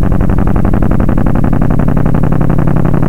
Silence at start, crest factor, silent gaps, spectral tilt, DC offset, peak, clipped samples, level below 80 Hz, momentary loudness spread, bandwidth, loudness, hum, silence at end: 0 s; 10 dB; none; -10 dB/octave; 30%; -2 dBFS; under 0.1%; -16 dBFS; 1 LU; 3.8 kHz; -12 LUFS; none; 0 s